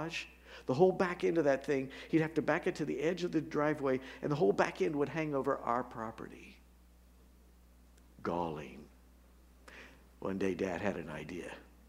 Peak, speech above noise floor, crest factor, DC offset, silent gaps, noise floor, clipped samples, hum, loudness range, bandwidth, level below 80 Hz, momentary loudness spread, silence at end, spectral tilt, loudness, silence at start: -14 dBFS; 27 dB; 22 dB; under 0.1%; none; -61 dBFS; under 0.1%; 60 Hz at -60 dBFS; 13 LU; 15 kHz; -62 dBFS; 18 LU; 0.25 s; -6.5 dB/octave; -35 LUFS; 0 s